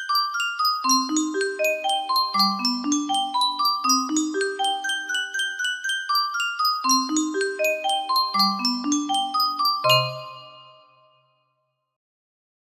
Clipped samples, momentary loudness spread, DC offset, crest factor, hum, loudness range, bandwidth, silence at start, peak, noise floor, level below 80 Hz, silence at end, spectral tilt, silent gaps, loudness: under 0.1%; 6 LU; under 0.1%; 18 dB; none; 3 LU; 15.5 kHz; 0 s; -6 dBFS; -74 dBFS; -74 dBFS; 2.05 s; -2 dB/octave; none; -22 LUFS